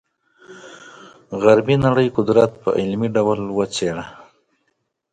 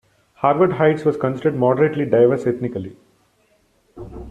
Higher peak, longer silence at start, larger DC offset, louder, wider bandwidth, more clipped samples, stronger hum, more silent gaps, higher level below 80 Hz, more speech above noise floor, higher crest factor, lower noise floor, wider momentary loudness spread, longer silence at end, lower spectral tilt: about the same, 0 dBFS vs -2 dBFS; about the same, 0.5 s vs 0.4 s; neither; about the same, -18 LUFS vs -18 LUFS; about the same, 9.4 kHz vs 8.8 kHz; neither; neither; neither; about the same, -50 dBFS vs -50 dBFS; first, 53 dB vs 43 dB; about the same, 20 dB vs 18 dB; first, -71 dBFS vs -61 dBFS; about the same, 21 LU vs 21 LU; first, 1 s vs 0 s; second, -6.5 dB/octave vs -9 dB/octave